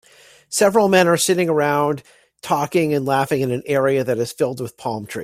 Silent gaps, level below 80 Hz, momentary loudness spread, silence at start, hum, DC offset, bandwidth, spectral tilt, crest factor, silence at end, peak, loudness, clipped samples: none; -62 dBFS; 12 LU; 0.5 s; none; under 0.1%; 16 kHz; -4.5 dB/octave; 16 dB; 0 s; -2 dBFS; -19 LUFS; under 0.1%